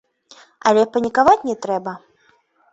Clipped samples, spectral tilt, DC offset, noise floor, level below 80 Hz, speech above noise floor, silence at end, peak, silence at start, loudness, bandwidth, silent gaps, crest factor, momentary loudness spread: under 0.1%; -4.5 dB/octave; under 0.1%; -59 dBFS; -58 dBFS; 42 dB; 0.75 s; -2 dBFS; 0.65 s; -17 LUFS; 8 kHz; none; 18 dB; 13 LU